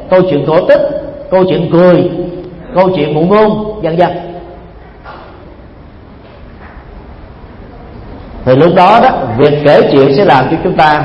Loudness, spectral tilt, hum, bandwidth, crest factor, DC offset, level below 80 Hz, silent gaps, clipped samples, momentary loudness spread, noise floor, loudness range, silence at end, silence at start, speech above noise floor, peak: -9 LUFS; -8.5 dB/octave; none; 7 kHz; 10 dB; under 0.1%; -36 dBFS; none; 0.5%; 21 LU; -33 dBFS; 11 LU; 0 s; 0 s; 26 dB; 0 dBFS